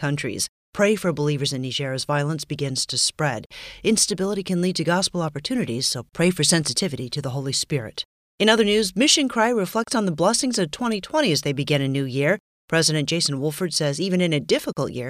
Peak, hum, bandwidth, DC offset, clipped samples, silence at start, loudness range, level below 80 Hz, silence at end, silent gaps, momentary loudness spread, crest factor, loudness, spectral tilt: -4 dBFS; none; 15.5 kHz; under 0.1%; under 0.1%; 0 s; 3 LU; -56 dBFS; 0 s; 0.49-0.73 s, 3.46-3.50 s, 8.05-8.38 s, 12.40-12.68 s; 9 LU; 20 dB; -22 LUFS; -4 dB/octave